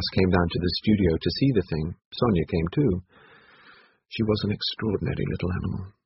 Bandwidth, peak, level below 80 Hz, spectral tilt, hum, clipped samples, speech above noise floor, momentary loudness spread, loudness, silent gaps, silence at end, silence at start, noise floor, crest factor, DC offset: 5.8 kHz; -6 dBFS; -42 dBFS; -6 dB/octave; none; under 0.1%; 30 dB; 8 LU; -25 LUFS; 2.05-2.11 s; 0.15 s; 0 s; -55 dBFS; 20 dB; under 0.1%